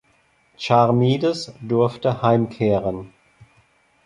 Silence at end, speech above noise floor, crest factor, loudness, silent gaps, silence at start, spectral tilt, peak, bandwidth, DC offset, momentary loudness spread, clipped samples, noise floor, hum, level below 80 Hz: 1 s; 42 dB; 20 dB; -20 LUFS; none; 0.6 s; -7.5 dB/octave; -2 dBFS; 11 kHz; under 0.1%; 12 LU; under 0.1%; -61 dBFS; none; -54 dBFS